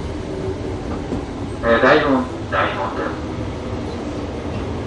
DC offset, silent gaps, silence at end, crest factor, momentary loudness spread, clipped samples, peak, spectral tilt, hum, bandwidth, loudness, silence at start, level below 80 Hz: under 0.1%; none; 0 s; 20 dB; 13 LU; under 0.1%; 0 dBFS; -6.5 dB/octave; none; 11 kHz; -21 LUFS; 0 s; -34 dBFS